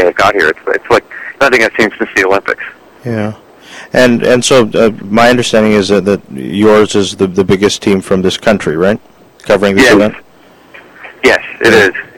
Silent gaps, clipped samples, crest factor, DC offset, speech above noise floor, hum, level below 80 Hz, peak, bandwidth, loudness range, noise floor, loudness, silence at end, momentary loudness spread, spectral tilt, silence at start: none; 0.6%; 10 dB; under 0.1%; 32 dB; none; -40 dBFS; 0 dBFS; 17 kHz; 3 LU; -41 dBFS; -10 LUFS; 0.1 s; 11 LU; -4.5 dB/octave; 0 s